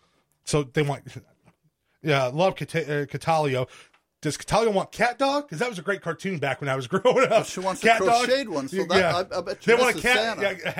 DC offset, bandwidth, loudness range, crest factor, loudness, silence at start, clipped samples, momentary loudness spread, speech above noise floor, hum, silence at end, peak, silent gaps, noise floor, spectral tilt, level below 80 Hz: under 0.1%; 16 kHz; 5 LU; 18 dB; -24 LUFS; 0.45 s; under 0.1%; 10 LU; 46 dB; none; 0 s; -6 dBFS; none; -69 dBFS; -4.5 dB/octave; -54 dBFS